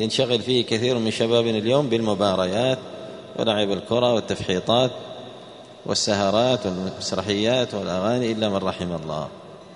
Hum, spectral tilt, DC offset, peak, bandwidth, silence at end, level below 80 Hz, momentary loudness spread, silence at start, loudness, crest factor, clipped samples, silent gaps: none; -5 dB/octave; under 0.1%; -4 dBFS; 11 kHz; 0 s; -56 dBFS; 15 LU; 0 s; -22 LUFS; 18 dB; under 0.1%; none